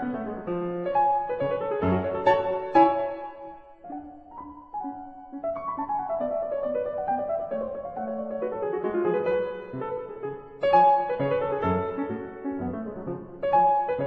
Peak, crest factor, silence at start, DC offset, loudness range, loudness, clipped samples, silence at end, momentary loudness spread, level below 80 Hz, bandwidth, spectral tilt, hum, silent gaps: -6 dBFS; 20 dB; 0 s; under 0.1%; 7 LU; -27 LUFS; under 0.1%; 0 s; 18 LU; -58 dBFS; 5.8 kHz; -9 dB/octave; none; none